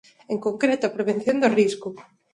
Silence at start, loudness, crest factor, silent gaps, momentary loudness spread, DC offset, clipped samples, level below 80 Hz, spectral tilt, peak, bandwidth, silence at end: 0.3 s; -23 LUFS; 18 dB; none; 12 LU; under 0.1%; under 0.1%; -68 dBFS; -5.5 dB/octave; -6 dBFS; 11.5 kHz; 0.3 s